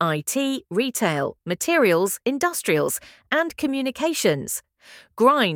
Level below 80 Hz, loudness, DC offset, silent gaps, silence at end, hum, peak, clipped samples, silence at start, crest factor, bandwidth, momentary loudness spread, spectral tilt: -64 dBFS; -22 LUFS; under 0.1%; none; 0 s; none; -4 dBFS; under 0.1%; 0 s; 20 dB; 18.5 kHz; 8 LU; -4 dB/octave